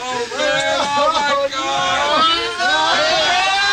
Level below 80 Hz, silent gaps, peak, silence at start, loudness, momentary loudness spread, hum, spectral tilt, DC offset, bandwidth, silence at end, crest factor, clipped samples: -50 dBFS; none; -4 dBFS; 0 s; -16 LUFS; 4 LU; none; -1 dB/octave; under 0.1%; 16 kHz; 0 s; 12 dB; under 0.1%